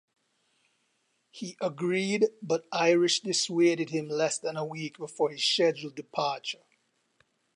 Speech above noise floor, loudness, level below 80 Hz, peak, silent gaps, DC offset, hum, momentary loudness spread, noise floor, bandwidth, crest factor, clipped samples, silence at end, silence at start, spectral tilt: 46 dB; -28 LUFS; -84 dBFS; -12 dBFS; none; under 0.1%; none; 13 LU; -74 dBFS; 10.5 kHz; 18 dB; under 0.1%; 1 s; 1.35 s; -3.5 dB/octave